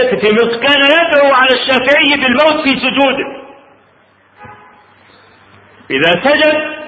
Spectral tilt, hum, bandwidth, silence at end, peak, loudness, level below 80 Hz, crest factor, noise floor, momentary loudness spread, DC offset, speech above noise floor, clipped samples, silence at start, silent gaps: -5.5 dB/octave; none; 7.8 kHz; 0 s; 0 dBFS; -10 LUFS; -50 dBFS; 12 dB; -49 dBFS; 5 LU; under 0.1%; 39 dB; under 0.1%; 0 s; none